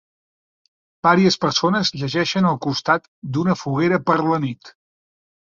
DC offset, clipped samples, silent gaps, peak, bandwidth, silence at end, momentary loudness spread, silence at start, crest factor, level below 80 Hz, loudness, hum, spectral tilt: under 0.1%; under 0.1%; 3.08-3.22 s; -2 dBFS; 7.6 kHz; 0.85 s; 7 LU; 1.05 s; 18 dB; -60 dBFS; -19 LUFS; none; -5.5 dB/octave